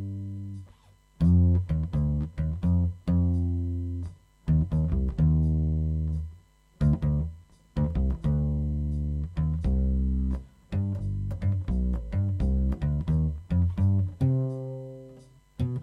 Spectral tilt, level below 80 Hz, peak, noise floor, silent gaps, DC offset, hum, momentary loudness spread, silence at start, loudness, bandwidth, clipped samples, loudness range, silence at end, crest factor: -10.5 dB/octave; -32 dBFS; -12 dBFS; -57 dBFS; none; under 0.1%; none; 12 LU; 0 s; -28 LUFS; 4.2 kHz; under 0.1%; 3 LU; 0 s; 14 dB